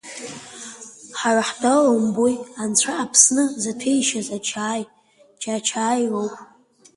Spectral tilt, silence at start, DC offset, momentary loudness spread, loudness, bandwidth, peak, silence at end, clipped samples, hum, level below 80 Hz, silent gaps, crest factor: -2.5 dB/octave; 0.05 s; under 0.1%; 20 LU; -20 LUFS; 11.5 kHz; 0 dBFS; 0.55 s; under 0.1%; none; -68 dBFS; none; 22 dB